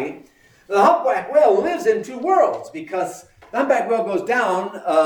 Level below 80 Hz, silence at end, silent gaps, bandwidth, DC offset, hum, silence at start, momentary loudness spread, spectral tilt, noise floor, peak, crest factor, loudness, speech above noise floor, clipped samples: -64 dBFS; 0 s; none; 20 kHz; under 0.1%; none; 0 s; 12 LU; -4.5 dB/octave; -51 dBFS; -4 dBFS; 16 dB; -19 LUFS; 32 dB; under 0.1%